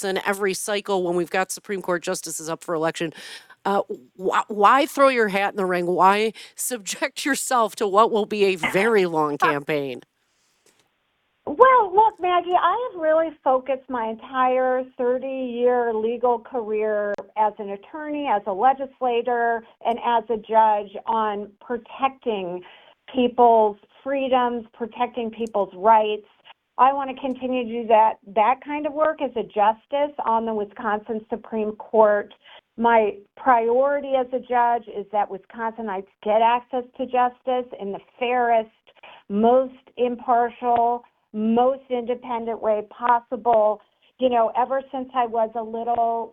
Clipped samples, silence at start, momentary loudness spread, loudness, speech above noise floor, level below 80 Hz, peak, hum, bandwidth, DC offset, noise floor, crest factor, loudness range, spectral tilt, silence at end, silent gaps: under 0.1%; 0 s; 12 LU; -22 LUFS; 48 dB; -64 dBFS; 0 dBFS; none; 16 kHz; under 0.1%; -70 dBFS; 22 dB; 4 LU; -4 dB/octave; 0.05 s; none